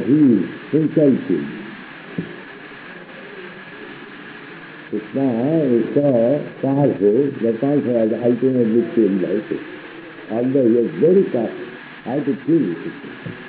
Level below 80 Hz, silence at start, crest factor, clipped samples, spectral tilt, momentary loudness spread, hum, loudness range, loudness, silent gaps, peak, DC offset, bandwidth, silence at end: -64 dBFS; 0 s; 14 dB; under 0.1%; -7.5 dB/octave; 20 LU; none; 12 LU; -18 LUFS; none; -4 dBFS; under 0.1%; 4.6 kHz; 0 s